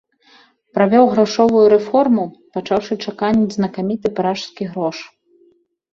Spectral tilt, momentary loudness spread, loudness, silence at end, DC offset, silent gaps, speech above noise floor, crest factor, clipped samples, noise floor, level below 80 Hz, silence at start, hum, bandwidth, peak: -6.5 dB/octave; 13 LU; -17 LUFS; 0.85 s; under 0.1%; none; 40 dB; 16 dB; under 0.1%; -56 dBFS; -56 dBFS; 0.75 s; none; 7.4 kHz; -2 dBFS